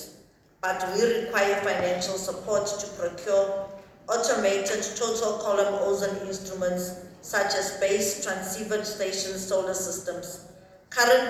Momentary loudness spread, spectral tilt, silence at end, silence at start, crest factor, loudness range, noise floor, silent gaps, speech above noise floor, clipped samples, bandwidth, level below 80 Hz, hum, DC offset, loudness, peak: 10 LU; -2.5 dB/octave; 0 s; 0 s; 20 dB; 2 LU; -56 dBFS; none; 29 dB; under 0.1%; 16 kHz; -60 dBFS; none; under 0.1%; -27 LUFS; -6 dBFS